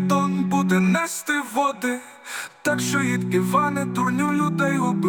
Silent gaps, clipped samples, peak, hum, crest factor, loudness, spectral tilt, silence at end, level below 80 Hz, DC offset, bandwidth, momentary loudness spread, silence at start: none; under 0.1%; -8 dBFS; none; 14 dB; -22 LUFS; -5.5 dB/octave; 0 s; -62 dBFS; under 0.1%; 18 kHz; 8 LU; 0 s